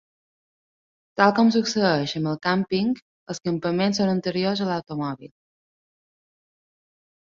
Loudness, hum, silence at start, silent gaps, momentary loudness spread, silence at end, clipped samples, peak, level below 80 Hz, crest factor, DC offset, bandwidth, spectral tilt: -23 LUFS; none; 1.15 s; 3.02-3.26 s; 12 LU; 1.95 s; under 0.1%; -2 dBFS; -64 dBFS; 22 dB; under 0.1%; 7.6 kHz; -5.5 dB/octave